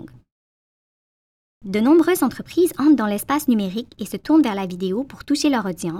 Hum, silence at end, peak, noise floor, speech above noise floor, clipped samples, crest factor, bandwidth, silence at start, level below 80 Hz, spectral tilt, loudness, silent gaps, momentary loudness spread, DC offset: none; 0 s; -6 dBFS; under -90 dBFS; over 71 dB; under 0.1%; 16 dB; 16.5 kHz; 0 s; -54 dBFS; -5 dB/octave; -19 LUFS; 0.32-1.61 s; 12 LU; under 0.1%